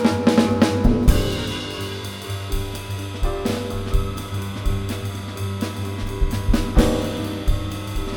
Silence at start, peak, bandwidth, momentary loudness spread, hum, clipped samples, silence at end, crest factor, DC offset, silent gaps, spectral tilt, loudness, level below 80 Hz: 0 s; -2 dBFS; 18.5 kHz; 11 LU; none; under 0.1%; 0 s; 20 dB; under 0.1%; none; -6 dB/octave; -23 LUFS; -26 dBFS